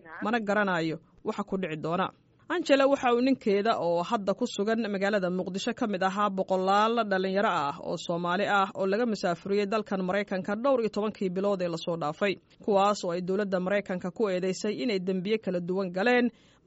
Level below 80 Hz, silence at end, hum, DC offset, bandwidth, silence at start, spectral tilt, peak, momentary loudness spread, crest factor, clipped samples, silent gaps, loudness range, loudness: -68 dBFS; 0.35 s; none; under 0.1%; 8 kHz; 0.05 s; -4 dB/octave; -8 dBFS; 7 LU; 20 dB; under 0.1%; none; 2 LU; -28 LUFS